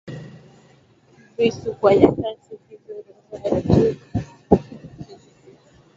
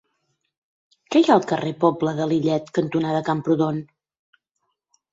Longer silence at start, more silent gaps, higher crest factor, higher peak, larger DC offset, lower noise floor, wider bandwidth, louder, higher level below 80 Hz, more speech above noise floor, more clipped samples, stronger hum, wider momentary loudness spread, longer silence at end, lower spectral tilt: second, 0.05 s vs 1.1 s; neither; about the same, 22 dB vs 20 dB; about the same, 0 dBFS vs -2 dBFS; neither; second, -54 dBFS vs -76 dBFS; about the same, 7.6 kHz vs 7.8 kHz; about the same, -20 LUFS vs -21 LUFS; first, -42 dBFS vs -64 dBFS; second, 36 dB vs 56 dB; neither; neither; first, 25 LU vs 7 LU; second, 0.8 s vs 1.3 s; about the same, -8 dB/octave vs -7 dB/octave